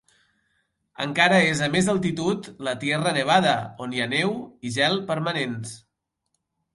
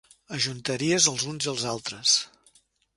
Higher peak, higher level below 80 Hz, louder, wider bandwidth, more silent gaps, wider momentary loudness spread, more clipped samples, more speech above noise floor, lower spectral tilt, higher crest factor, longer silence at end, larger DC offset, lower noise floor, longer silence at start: about the same, -4 dBFS vs -6 dBFS; about the same, -62 dBFS vs -66 dBFS; about the same, -23 LUFS vs -24 LUFS; about the same, 11.5 kHz vs 11.5 kHz; neither; first, 12 LU vs 9 LU; neither; first, 54 dB vs 36 dB; first, -4.5 dB/octave vs -2 dB/octave; about the same, 20 dB vs 24 dB; first, 1 s vs 0.7 s; neither; first, -77 dBFS vs -62 dBFS; first, 1 s vs 0.3 s